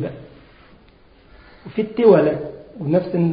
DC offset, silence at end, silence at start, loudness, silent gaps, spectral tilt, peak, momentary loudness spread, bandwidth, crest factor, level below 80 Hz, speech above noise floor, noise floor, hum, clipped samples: under 0.1%; 0 s; 0 s; -18 LUFS; none; -13 dB/octave; -2 dBFS; 18 LU; 5.2 kHz; 18 dB; -52 dBFS; 32 dB; -50 dBFS; none; under 0.1%